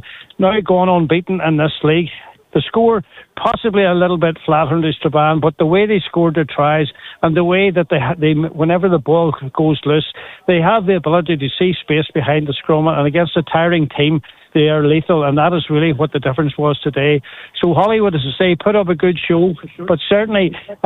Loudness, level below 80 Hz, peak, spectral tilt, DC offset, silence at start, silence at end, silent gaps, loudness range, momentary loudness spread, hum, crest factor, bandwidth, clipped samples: -15 LUFS; -48 dBFS; 0 dBFS; -9 dB/octave; under 0.1%; 0.05 s; 0.1 s; none; 1 LU; 6 LU; none; 14 dB; 4.1 kHz; under 0.1%